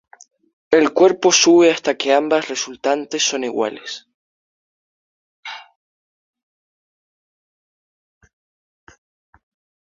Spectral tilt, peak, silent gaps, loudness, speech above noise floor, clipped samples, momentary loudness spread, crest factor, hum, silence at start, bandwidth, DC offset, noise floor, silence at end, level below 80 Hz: -2 dB/octave; 0 dBFS; 4.14-5.43 s; -16 LUFS; over 74 dB; under 0.1%; 22 LU; 20 dB; none; 0.7 s; 7.6 kHz; under 0.1%; under -90 dBFS; 4.2 s; -66 dBFS